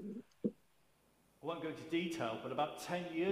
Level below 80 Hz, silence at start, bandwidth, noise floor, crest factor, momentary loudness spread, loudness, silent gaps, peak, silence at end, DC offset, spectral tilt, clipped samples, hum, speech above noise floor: -80 dBFS; 0 s; 15.5 kHz; -73 dBFS; 18 dB; 7 LU; -41 LUFS; none; -22 dBFS; 0 s; under 0.1%; -5.5 dB/octave; under 0.1%; none; 34 dB